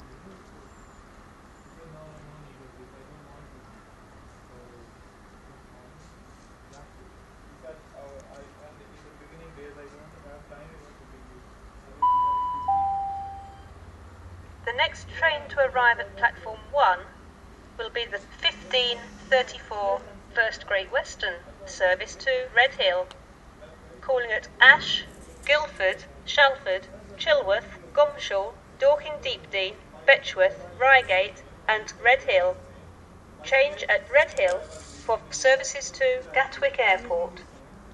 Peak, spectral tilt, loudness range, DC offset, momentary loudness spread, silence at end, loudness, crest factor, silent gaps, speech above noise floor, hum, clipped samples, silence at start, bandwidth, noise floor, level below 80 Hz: 0 dBFS; -2 dB/octave; 7 LU; under 0.1%; 20 LU; 0.05 s; -24 LUFS; 26 dB; none; 26 dB; none; under 0.1%; 0 s; 11 kHz; -50 dBFS; -52 dBFS